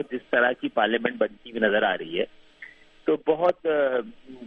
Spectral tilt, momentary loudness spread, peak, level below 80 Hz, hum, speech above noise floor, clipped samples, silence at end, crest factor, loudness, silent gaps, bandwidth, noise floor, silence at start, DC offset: -6.5 dB/octave; 10 LU; -6 dBFS; -64 dBFS; none; 23 dB; under 0.1%; 0 s; 20 dB; -25 LUFS; none; 5 kHz; -48 dBFS; 0 s; under 0.1%